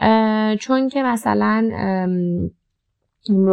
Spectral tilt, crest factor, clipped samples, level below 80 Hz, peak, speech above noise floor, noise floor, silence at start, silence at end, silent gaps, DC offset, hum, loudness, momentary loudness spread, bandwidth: -7 dB/octave; 14 dB; under 0.1%; -56 dBFS; -4 dBFS; 55 dB; -73 dBFS; 0 s; 0 s; none; under 0.1%; none; -19 LUFS; 7 LU; 12.5 kHz